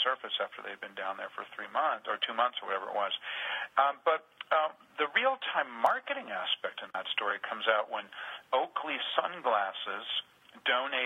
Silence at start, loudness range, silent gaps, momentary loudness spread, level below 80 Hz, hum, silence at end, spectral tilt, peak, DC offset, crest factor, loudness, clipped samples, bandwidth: 0 s; 3 LU; none; 9 LU; -88 dBFS; none; 0 s; -2.5 dB/octave; -10 dBFS; under 0.1%; 22 dB; -32 LUFS; under 0.1%; 14 kHz